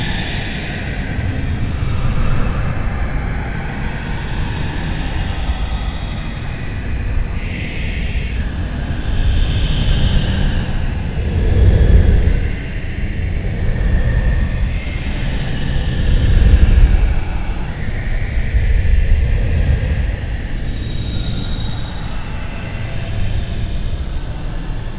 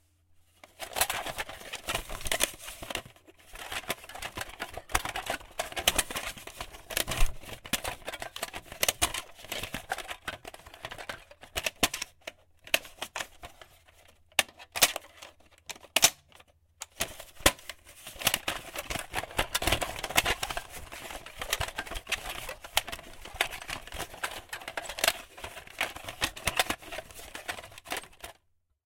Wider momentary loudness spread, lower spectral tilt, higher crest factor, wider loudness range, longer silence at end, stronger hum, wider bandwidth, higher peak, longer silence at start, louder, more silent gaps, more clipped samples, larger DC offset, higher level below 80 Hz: second, 10 LU vs 18 LU; first, -10.5 dB/octave vs -1 dB/octave; second, 16 dB vs 30 dB; about the same, 6 LU vs 5 LU; second, 0 s vs 0.55 s; neither; second, 4 kHz vs 17 kHz; first, 0 dBFS vs -4 dBFS; second, 0 s vs 0.65 s; first, -20 LUFS vs -32 LUFS; neither; neither; first, 0.5% vs under 0.1%; first, -18 dBFS vs -46 dBFS